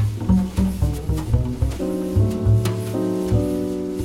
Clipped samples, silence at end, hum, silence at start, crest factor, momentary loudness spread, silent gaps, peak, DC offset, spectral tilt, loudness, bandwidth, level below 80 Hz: under 0.1%; 0 s; none; 0 s; 14 dB; 5 LU; none; -6 dBFS; under 0.1%; -8 dB/octave; -22 LUFS; 15.5 kHz; -28 dBFS